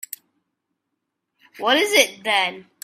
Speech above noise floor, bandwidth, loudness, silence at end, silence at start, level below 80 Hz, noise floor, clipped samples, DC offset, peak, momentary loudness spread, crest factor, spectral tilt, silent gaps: 59 dB; 16 kHz; -18 LUFS; 0.25 s; 1.6 s; -74 dBFS; -79 dBFS; under 0.1%; under 0.1%; 0 dBFS; 17 LU; 24 dB; -0.5 dB/octave; none